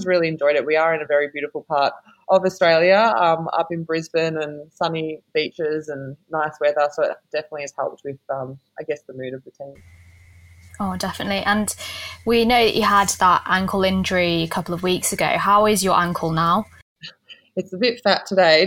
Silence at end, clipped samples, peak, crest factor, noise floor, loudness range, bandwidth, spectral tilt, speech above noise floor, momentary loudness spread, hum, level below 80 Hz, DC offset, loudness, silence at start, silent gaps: 0 s; under 0.1%; -2 dBFS; 18 dB; -48 dBFS; 10 LU; 17 kHz; -4 dB/octave; 28 dB; 16 LU; none; -52 dBFS; under 0.1%; -20 LUFS; 0 s; 16.82-16.96 s